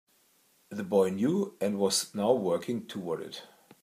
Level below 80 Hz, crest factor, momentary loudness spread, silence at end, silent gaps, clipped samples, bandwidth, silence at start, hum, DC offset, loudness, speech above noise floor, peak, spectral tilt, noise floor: -78 dBFS; 20 dB; 13 LU; 0.4 s; none; under 0.1%; 15.5 kHz; 0.7 s; none; under 0.1%; -30 LUFS; 38 dB; -12 dBFS; -4.5 dB/octave; -67 dBFS